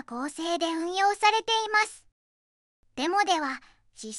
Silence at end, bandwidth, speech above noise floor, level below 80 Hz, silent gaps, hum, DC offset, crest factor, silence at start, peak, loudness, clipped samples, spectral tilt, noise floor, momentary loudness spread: 0 s; 11.5 kHz; over 63 dB; -68 dBFS; 2.12-2.83 s; none; under 0.1%; 20 dB; 0.1 s; -8 dBFS; -26 LUFS; under 0.1%; -0.5 dB/octave; under -90 dBFS; 13 LU